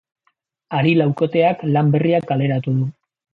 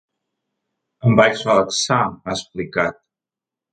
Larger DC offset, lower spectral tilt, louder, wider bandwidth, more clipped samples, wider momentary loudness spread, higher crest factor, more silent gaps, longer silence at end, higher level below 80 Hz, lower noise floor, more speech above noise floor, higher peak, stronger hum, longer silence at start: neither; first, -10 dB/octave vs -4.5 dB/octave; about the same, -18 LUFS vs -18 LUFS; second, 4.7 kHz vs 9.2 kHz; neither; second, 6 LU vs 11 LU; about the same, 16 dB vs 20 dB; neither; second, 0.4 s vs 0.8 s; second, -60 dBFS vs -52 dBFS; second, -68 dBFS vs -88 dBFS; second, 51 dB vs 70 dB; second, -4 dBFS vs 0 dBFS; neither; second, 0.7 s vs 1.05 s